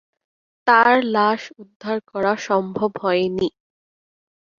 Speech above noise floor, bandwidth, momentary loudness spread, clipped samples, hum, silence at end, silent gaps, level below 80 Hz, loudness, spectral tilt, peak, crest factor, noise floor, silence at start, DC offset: over 71 dB; 7.4 kHz; 13 LU; under 0.1%; none; 1.1 s; 1.76-1.80 s; -62 dBFS; -19 LUFS; -5.5 dB/octave; -2 dBFS; 20 dB; under -90 dBFS; 0.65 s; under 0.1%